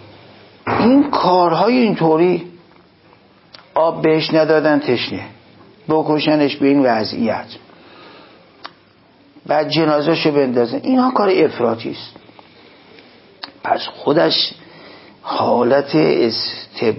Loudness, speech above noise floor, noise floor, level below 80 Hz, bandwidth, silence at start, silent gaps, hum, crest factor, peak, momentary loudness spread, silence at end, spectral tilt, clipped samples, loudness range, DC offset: -16 LUFS; 35 dB; -50 dBFS; -56 dBFS; 5.8 kHz; 0.65 s; none; none; 16 dB; -2 dBFS; 15 LU; 0 s; -9.5 dB/octave; under 0.1%; 5 LU; under 0.1%